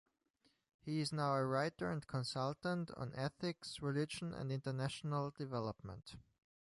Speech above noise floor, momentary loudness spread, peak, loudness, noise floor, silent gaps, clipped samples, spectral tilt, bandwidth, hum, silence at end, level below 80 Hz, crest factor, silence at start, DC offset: 38 dB; 11 LU; -24 dBFS; -41 LUFS; -79 dBFS; none; under 0.1%; -6 dB/octave; 11.5 kHz; none; 0.4 s; -70 dBFS; 18 dB; 0.85 s; under 0.1%